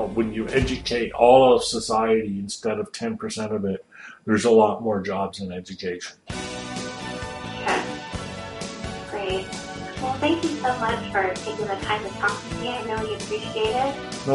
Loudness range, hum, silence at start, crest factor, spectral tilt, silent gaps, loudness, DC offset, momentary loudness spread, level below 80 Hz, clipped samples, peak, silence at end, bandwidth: 9 LU; none; 0 s; 20 dB; -4.5 dB/octave; none; -24 LUFS; under 0.1%; 15 LU; -46 dBFS; under 0.1%; -4 dBFS; 0 s; 11.5 kHz